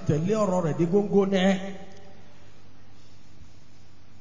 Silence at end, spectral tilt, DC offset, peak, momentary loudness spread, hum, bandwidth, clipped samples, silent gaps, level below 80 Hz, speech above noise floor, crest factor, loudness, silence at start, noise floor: 0.75 s; -7 dB/octave; 2%; -10 dBFS; 11 LU; none; 7.6 kHz; under 0.1%; none; -60 dBFS; 31 dB; 16 dB; -24 LUFS; 0 s; -54 dBFS